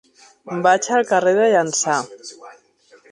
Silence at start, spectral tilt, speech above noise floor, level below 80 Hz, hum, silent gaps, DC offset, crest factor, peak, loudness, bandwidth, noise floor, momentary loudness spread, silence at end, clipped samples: 0.45 s; -3 dB/octave; 35 dB; -72 dBFS; none; none; under 0.1%; 18 dB; -2 dBFS; -17 LUFS; 11 kHz; -53 dBFS; 18 LU; 0.6 s; under 0.1%